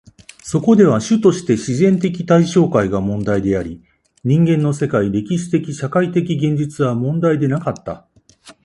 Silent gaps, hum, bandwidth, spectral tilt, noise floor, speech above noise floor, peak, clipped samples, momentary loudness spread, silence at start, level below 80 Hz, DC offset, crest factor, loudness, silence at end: none; none; 11.5 kHz; -7 dB/octave; -46 dBFS; 31 dB; 0 dBFS; under 0.1%; 9 LU; 0.45 s; -46 dBFS; under 0.1%; 16 dB; -16 LUFS; 0.15 s